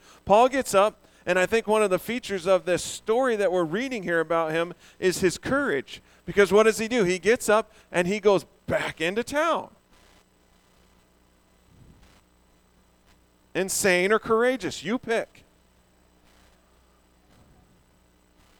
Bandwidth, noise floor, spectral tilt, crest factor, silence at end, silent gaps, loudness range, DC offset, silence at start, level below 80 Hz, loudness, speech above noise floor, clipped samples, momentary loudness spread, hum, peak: 18 kHz; -61 dBFS; -4 dB/octave; 20 dB; 3.35 s; none; 9 LU; under 0.1%; 0.25 s; -56 dBFS; -24 LUFS; 37 dB; under 0.1%; 10 LU; none; -6 dBFS